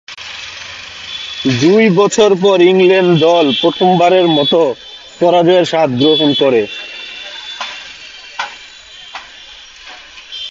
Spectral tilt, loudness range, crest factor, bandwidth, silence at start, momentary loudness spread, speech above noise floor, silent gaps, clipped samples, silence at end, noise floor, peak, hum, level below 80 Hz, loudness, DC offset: -5 dB/octave; 16 LU; 12 dB; 7.8 kHz; 0.1 s; 22 LU; 26 dB; none; under 0.1%; 0 s; -36 dBFS; 0 dBFS; none; -54 dBFS; -11 LUFS; under 0.1%